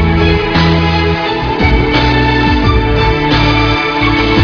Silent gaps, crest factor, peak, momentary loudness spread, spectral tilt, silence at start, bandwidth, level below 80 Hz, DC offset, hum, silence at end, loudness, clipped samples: none; 10 dB; 0 dBFS; 2 LU; -7 dB/octave; 0 s; 5.4 kHz; -18 dBFS; under 0.1%; none; 0 s; -11 LUFS; 0.1%